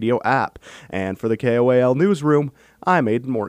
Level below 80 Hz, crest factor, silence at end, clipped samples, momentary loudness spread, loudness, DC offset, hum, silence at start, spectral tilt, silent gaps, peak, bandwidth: -58 dBFS; 14 dB; 0 s; under 0.1%; 11 LU; -19 LUFS; under 0.1%; none; 0 s; -7.5 dB/octave; none; -4 dBFS; 12.5 kHz